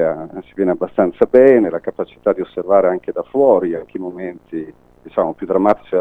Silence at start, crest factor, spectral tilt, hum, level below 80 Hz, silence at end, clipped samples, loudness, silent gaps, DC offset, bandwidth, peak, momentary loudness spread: 0 s; 16 dB; -9.5 dB/octave; none; -54 dBFS; 0 s; under 0.1%; -16 LUFS; none; under 0.1%; 4.4 kHz; 0 dBFS; 17 LU